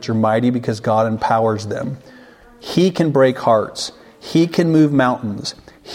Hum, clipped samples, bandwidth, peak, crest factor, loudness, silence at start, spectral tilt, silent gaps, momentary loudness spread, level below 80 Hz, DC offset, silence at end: none; under 0.1%; 15.5 kHz; -2 dBFS; 16 dB; -17 LUFS; 0 s; -6.5 dB/octave; none; 14 LU; -54 dBFS; under 0.1%; 0 s